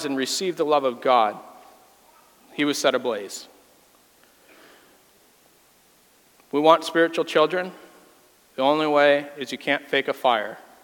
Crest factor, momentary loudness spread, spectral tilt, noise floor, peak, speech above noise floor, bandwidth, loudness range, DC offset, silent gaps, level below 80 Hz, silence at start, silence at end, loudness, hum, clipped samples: 24 dB; 16 LU; -3.5 dB/octave; -58 dBFS; -2 dBFS; 36 dB; 18 kHz; 8 LU; under 0.1%; none; -78 dBFS; 0 s; 0.25 s; -22 LUFS; none; under 0.1%